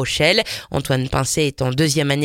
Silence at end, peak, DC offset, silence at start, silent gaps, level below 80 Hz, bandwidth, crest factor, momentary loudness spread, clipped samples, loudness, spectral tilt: 0 s; -2 dBFS; under 0.1%; 0 s; none; -40 dBFS; 17 kHz; 16 dB; 6 LU; under 0.1%; -18 LUFS; -4 dB/octave